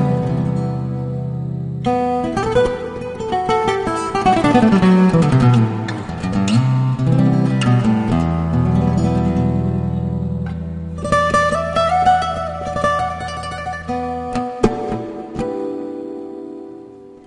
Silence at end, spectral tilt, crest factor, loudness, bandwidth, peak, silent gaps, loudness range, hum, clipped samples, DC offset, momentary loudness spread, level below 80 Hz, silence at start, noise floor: 0.1 s; -7.5 dB/octave; 16 dB; -18 LUFS; 10.5 kHz; -2 dBFS; none; 7 LU; none; under 0.1%; under 0.1%; 13 LU; -36 dBFS; 0 s; -38 dBFS